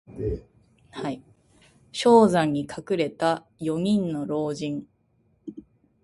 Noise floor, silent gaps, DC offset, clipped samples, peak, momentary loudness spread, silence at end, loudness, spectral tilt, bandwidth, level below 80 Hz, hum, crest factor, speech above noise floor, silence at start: -66 dBFS; none; under 0.1%; under 0.1%; -4 dBFS; 24 LU; 0.4 s; -24 LUFS; -6 dB/octave; 11.5 kHz; -50 dBFS; none; 22 dB; 43 dB; 0.1 s